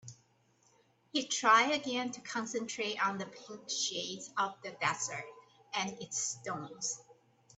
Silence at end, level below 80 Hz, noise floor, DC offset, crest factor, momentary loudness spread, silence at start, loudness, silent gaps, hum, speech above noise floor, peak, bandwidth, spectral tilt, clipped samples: 0.45 s; -82 dBFS; -70 dBFS; under 0.1%; 24 dB; 16 LU; 0.05 s; -34 LUFS; none; none; 35 dB; -12 dBFS; 8.6 kHz; -1.5 dB/octave; under 0.1%